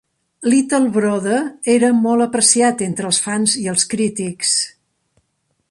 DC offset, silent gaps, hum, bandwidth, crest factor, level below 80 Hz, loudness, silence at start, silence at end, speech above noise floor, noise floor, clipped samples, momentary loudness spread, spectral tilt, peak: under 0.1%; none; none; 11.5 kHz; 18 dB; -62 dBFS; -16 LUFS; 0.4 s; 1 s; 52 dB; -68 dBFS; under 0.1%; 7 LU; -3 dB/octave; 0 dBFS